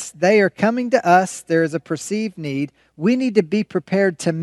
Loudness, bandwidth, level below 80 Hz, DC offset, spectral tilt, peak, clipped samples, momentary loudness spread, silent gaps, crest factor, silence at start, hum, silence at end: -19 LUFS; 12.5 kHz; -66 dBFS; under 0.1%; -5.5 dB/octave; 0 dBFS; under 0.1%; 10 LU; none; 18 dB; 0 s; none; 0 s